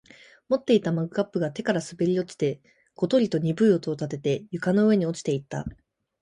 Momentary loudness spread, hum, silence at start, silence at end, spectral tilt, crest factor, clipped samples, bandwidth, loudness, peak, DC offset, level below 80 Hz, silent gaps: 9 LU; none; 0.5 s; 0.5 s; -7 dB/octave; 16 dB; under 0.1%; 11 kHz; -25 LUFS; -8 dBFS; under 0.1%; -58 dBFS; none